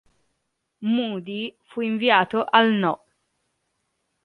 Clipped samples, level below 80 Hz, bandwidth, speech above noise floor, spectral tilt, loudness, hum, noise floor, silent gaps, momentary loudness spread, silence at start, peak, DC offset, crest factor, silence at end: under 0.1%; -72 dBFS; 4.8 kHz; 54 dB; -7 dB/octave; -22 LUFS; none; -76 dBFS; none; 13 LU; 0.8 s; -2 dBFS; under 0.1%; 22 dB; 1.3 s